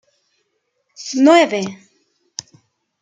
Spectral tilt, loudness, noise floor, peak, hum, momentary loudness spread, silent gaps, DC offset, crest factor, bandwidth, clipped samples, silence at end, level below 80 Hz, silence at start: -4 dB/octave; -15 LUFS; -69 dBFS; -2 dBFS; none; 22 LU; none; under 0.1%; 18 dB; 9.4 kHz; under 0.1%; 1.25 s; -70 dBFS; 1 s